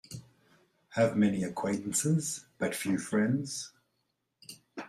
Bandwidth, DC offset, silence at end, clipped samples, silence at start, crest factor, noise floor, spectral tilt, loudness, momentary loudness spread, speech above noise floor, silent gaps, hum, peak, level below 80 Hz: 15.5 kHz; under 0.1%; 0 s; under 0.1%; 0.1 s; 20 dB; -80 dBFS; -5 dB/octave; -31 LUFS; 19 LU; 50 dB; none; none; -14 dBFS; -70 dBFS